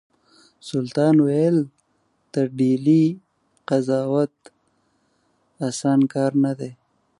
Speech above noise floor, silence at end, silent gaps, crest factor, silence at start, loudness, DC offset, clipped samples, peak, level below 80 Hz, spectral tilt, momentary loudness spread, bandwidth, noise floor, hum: 48 dB; 0.45 s; none; 16 dB; 0.65 s; -21 LUFS; under 0.1%; under 0.1%; -6 dBFS; -72 dBFS; -7.5 dB/octave; 15 LU; 11.5 kHz; -67 dBFS; none